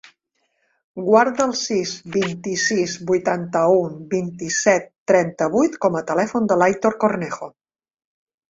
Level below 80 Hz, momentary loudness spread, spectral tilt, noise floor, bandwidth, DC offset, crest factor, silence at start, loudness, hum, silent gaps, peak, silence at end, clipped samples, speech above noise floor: -62 dBFS; 8 LU; -4.5 dB/octave; -70 dBFS; 7.8 kHz; under 0.1%; 18 dB; 0.95 s; -20 LUFS; none; 4.98-5.06 s; -2 dBFS; 1.05 s; under 0.1%; 51 dB